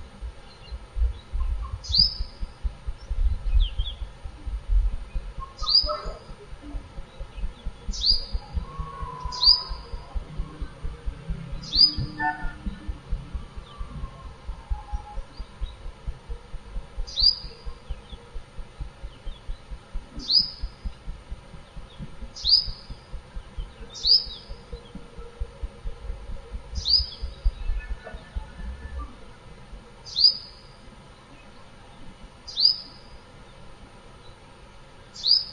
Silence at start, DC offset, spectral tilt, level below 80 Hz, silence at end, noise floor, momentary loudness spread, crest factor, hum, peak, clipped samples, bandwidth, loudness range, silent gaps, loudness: 0 s; under 0.1%; -3.5 dB/octave; -34 dBFS; 0 s; -47 dBFS; 24 LU; 24 dB; none; -4 dBFS; under 0.1%; 10.5 kHz; 7 LU; none; -23 LUFS